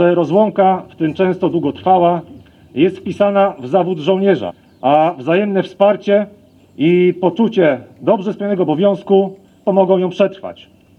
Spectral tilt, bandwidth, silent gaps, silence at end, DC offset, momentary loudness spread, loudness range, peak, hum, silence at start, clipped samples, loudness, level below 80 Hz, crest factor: -8.5 dB/octave; 6.6 kHz; none; 0.45 s; under 0.1%; 7 LU; 1 LU; 0 dBFS; none; 0 s; under 0.1%; -15 LUFS; -62 dBFS; 14 dB